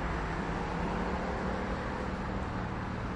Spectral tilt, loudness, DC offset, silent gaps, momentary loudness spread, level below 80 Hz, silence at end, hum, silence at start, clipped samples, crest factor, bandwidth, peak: -7 dB/octave; -35 LUFS; under 0.1%; none; 2 LU; -42 dBFS; 0 s; none; 0 s; under 0.1%; 12 dB; 11 kHz; -22 dBFS